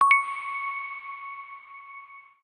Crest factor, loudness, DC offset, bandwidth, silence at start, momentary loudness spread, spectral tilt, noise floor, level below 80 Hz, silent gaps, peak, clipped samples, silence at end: 22 dB; -28 LUFS; under 0.1%; 9.4 kHz; 0 s; 22 LU; 1.5 dB/octave; -47 dBFS; -84 dBFS; none; -6 dBFS; under 0.1%; 0.25 s